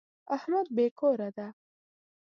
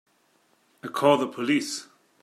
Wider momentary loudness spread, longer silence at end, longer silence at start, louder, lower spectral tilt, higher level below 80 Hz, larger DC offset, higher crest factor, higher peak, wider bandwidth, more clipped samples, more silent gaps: about the same, 14 LU vs 14 LU; first, 0.75 s vs 0.4 s; second, 0.3 s vs 0.85 s; second, -30 LUFS vs -25 LUFS; first, -8 dB/octave vs -4.5 dB/octave; about the same, -84 dBFS vs -80 dBFS; neither; second, 16 dB vs 22 dB; second, -16 dBFS vs -6 dBFS; second, 6.6 kHz vs 14.5 kHz; neither; first, 0.91-0.96 s vs none